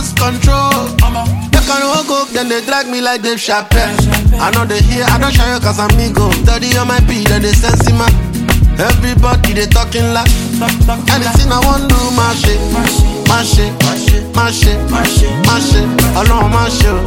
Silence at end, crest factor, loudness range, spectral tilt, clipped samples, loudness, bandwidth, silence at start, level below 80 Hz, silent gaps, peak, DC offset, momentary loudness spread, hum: 0 s; 10 dB; 2 LU; -4.5 dB/octave; under 0.1%; -11 LUFS; 17.5 kHz; 0 s; -14 dBFS; none; 0 dBFS; under 0.1%; 3 LU; none